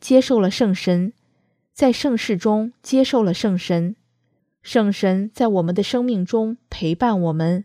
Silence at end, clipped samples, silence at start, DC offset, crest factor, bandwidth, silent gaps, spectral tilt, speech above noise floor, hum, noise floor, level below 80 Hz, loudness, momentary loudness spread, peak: 0 s; under 0.1%; 0 s; under 0.1%; 18 dB; 14.5 kHz; none; -6.5 dB/octave; 49 dB; none; -68 dBFS; -52 dBFS; -20 LUFS; 5 LU; -2 dBFS